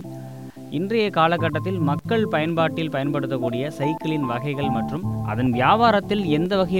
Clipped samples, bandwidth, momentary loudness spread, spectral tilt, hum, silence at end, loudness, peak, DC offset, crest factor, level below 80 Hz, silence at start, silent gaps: under 0.1%; 17 kHz; 9 LU; -7.5 dB/octave; none; 0 s; -22 LUFS; -4 dBFS; 0.3%; 18 dB; -50 dBFS; 0 s; none